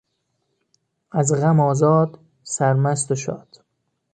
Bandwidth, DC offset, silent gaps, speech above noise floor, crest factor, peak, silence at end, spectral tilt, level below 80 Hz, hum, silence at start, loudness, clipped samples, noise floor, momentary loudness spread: 9.4 kHz; under 0.1%; none; 54 dB; 18 dB; -4 dBFS; 0.75 s; -6.5 dB/octave; -62 dBFS; none; 1.15 s; -20 LUFS; under 0.1%; -72 dBFS; 12 LU